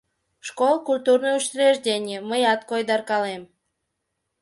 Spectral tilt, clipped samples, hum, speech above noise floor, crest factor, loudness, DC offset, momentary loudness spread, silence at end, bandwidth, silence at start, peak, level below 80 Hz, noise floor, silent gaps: -2.5 dB/octave; under 0.1%; none; 57 dB; 18 dB; -22 LUFS; under 0.1%; 10 LU; 1 s; 11.5 kHz; 0.45 s; -6 dBFS; -74 dBFS; -78 dBFS; none